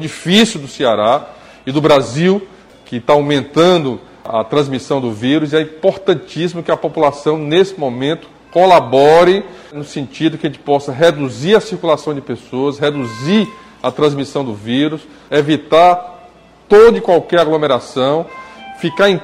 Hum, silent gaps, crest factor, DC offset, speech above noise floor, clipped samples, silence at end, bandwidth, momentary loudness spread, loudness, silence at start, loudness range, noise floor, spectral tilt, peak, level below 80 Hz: none; none; 14 dB; under 0.1%; 29 dB; under 0.1%; 0 s; 14.5 kHz; 13 LU; -14 LUFS; 0 s; 4 LU; -42 dBFS; -5.5 dB/octave; 0 dBFS; -50 dBFS